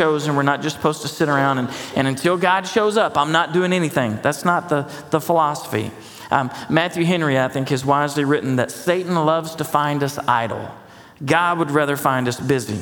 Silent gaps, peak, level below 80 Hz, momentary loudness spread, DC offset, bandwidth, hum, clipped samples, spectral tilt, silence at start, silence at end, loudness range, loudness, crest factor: none; 0 dBFS; -58 dBFS; 6 LU; under 0.1%; 19 kHz; none; under 0.1%; -5.5 dB/octave; 0 s; 0 s; 2 LU; -19 LUFS; 18 dB